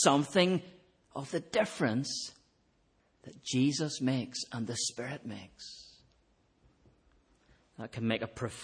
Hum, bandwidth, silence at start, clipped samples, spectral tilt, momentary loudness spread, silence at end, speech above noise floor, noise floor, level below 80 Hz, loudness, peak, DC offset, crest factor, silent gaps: none; 10.5 kHz; 0 s; under 0.1%; -4.5 dB/octave; 18 LU; 0 s; 39 dB; -71 dBFS; -70 dBFS; -33 LUFS; -12 dBFS; under 0.1%; 22 dB; none